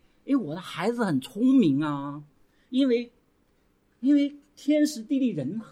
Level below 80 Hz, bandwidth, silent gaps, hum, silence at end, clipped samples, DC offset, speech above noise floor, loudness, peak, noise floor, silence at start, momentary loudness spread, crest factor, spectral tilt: -70 dBFS; 13 kHz; none; none; 0.05 s; under 0.1%; under 0.1%; 41 dB; -26 LUFS; -12 dBFS; -66 dBFS; 0.25 s; 12 LU; 14 dB; -6.5 dB/octave